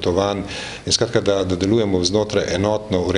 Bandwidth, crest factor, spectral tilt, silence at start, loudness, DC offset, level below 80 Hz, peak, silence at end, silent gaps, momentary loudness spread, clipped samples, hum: 11.5 kHz; 18 dB; -4.5 dB/octave; 0 s; -19 LUFS; under 0.1%; -44 dBFS; -2 dBFS; 0 s; none; 6 LU; under 0.1%; none